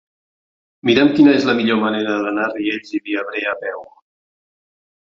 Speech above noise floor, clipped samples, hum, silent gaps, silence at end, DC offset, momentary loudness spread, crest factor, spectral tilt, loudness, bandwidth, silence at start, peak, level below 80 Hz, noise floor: over 73 dB; under 0.1%; none; none; 1.2 s; under 0.1%; 12 LU; 18 dB; -6 dB/octave; -17 LUFS; 7.2 kHz; 0.85 s; -2 dBFS; -60 dBFS; under -90 dBFS